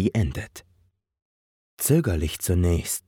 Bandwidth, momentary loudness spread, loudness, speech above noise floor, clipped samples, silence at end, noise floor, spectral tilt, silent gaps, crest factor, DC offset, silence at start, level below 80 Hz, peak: 19 kHz; 10 LU; -24 LUFS; 41 dB; under 0.1%; 0.1 s; -65 dBFS; -5.5 dB/octave; 1.22-1.77 s; 18 dB; under 0.1%; 0 s; -36 dBFS; -8 dBFS